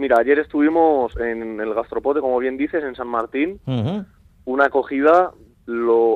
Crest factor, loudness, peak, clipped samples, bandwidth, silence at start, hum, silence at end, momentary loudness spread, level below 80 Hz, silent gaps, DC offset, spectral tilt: 16 dB; -20 LUFS; -2 dBFS; under 0.1%; 7.4 kHz; 0 s; none; 0 s; 10 LU; -48 dBFS; none; under 0.1%; -8.5 dB/octave